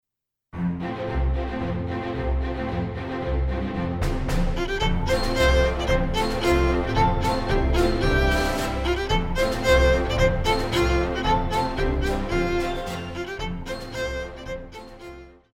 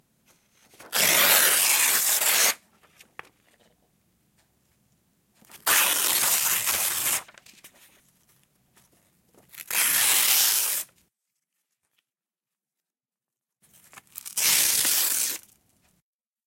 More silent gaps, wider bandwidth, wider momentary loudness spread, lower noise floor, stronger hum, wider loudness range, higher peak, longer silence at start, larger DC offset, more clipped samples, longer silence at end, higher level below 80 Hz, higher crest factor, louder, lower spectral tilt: neither; about the same, 16 kHz vs 16.5 kHz; about the same, 10 LU vs 12 LU; second, -73 dBFS vs under -90 dBFS; neither; second, 6 LU vs 9 LU; about the same, -6 dBFS vs -4 dBFS; second, 0.55 s vs 0.8 s; neither; neither; second, 0.25 s vs 1.1 s; first, -28 dBFS vs -72 dBFS; about the same, 18 dB vs 22 dB; second, -24 LUFS vs -20 LUFS; first, -5.5 dB/octave vs 2 dB/octave